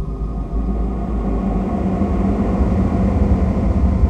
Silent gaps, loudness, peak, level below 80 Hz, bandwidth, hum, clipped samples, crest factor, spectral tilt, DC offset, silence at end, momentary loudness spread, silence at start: none; -19 LUFS; -4 dBFS; -20 dBFS; 6.4 kHz; none; under 0.1%; 14 dB; -10 dB/octave; under 0.1%; 0 s; 6 LU; 0 s